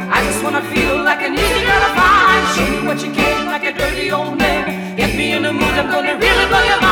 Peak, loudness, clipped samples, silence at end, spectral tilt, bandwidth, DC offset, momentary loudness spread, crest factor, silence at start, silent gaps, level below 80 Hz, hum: -2 dBFS; -14 LUFS; under 0.1%; 0 s; -3.5 dB/octave; over 20 kHz; under 0.1%; 7 LU; 12 dB; 0 s; none; -30 dBFS; none